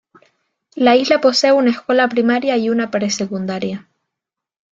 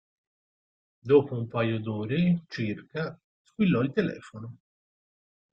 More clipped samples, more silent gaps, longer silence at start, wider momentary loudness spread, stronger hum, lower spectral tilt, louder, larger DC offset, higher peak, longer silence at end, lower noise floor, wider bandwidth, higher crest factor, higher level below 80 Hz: neither; second, none vs 3.24-3.45 s; second, 0.75 s vs 1.05 s; second, 11 LU vs 20 LU; neither; second, -4 dB/octave vs -8.5 dB/octave; first, -16 LUFS vs -27 LUFS; neither; first, 0 dBFS vs -8 dBFS; about the same, 0.95 s vs 0.95 s; second, -83 dBFS vs under -90 dBFS; about the same, 8 kHz vs 7.6 kHz; second, 16 dB vs 22 dB; about the same, -62 dBFS vs -66 dBFS